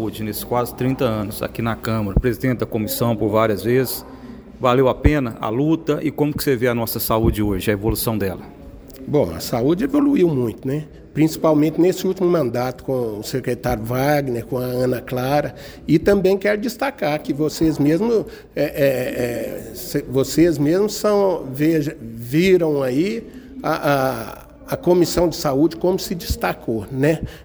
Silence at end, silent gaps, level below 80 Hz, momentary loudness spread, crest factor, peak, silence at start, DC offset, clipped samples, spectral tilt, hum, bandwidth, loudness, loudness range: 0 s; none; -36 dBFS; 10 LU; 18 dB; 0 dBFS; 0 s; under 0.1%; under 0.1%; -6 dB/octave; none; over 20 kHz; -20 LUFS; 2 LU